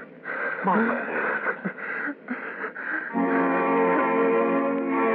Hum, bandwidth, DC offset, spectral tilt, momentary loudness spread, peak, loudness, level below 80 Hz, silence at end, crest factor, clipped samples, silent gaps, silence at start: none; 4.4 kHz; under 0.1%; -5 dB/octave; 10 LU; -12 dBFS; -25 LUFS; -78 dBFS; 0 s; 14 dB; under 0.1%; none; 0 s